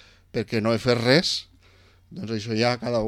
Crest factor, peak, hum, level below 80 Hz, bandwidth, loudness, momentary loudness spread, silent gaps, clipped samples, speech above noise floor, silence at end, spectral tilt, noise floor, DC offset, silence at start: 22 dB; -2 dBFS; none; -54 dBFS; 14 kHz; -23 LUFS; 14 LU; none; under 0.1%; 32 dB; 0 s; -5 dB/octave; -55 dBFS; under 0.1%; 0.35 s